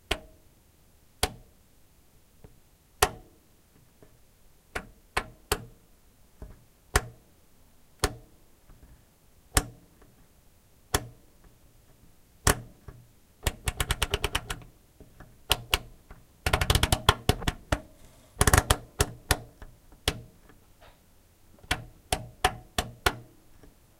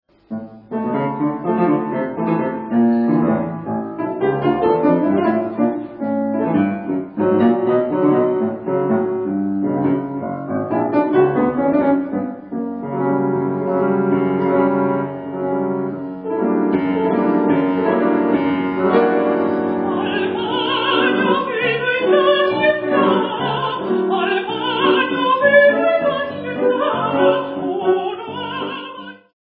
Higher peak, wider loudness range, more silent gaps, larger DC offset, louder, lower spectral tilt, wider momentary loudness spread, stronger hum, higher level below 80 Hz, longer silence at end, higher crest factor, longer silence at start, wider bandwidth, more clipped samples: about the same, -2 dBFS vs -2 dBFS; first, 10 LU vs 3 LU; neither; neither; second, -29 LUFS vs -18 LUFS; second, -3 dB/octave vs -10.5 dB/octave; first, 24 LU vs 9 LU; neither; first, -40 dBFS vs -58 dBFS; first, 0.8 s vs 0.25 s; first, 32 dB vs 16 dB; second, 0.1 s vs 0.3 s; first, 16.5 kHz vs 4.9 kHz; neither